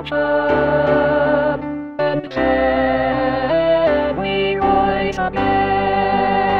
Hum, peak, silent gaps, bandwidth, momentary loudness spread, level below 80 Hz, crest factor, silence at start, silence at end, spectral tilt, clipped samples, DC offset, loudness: none; -4 dBFS; none; 7 kHz; 5 LU; -38 dBFS; 14 dB; 0 s; 0 s; -7.5 dB/octave; under 0.1%; 0.5%; -17 LUFS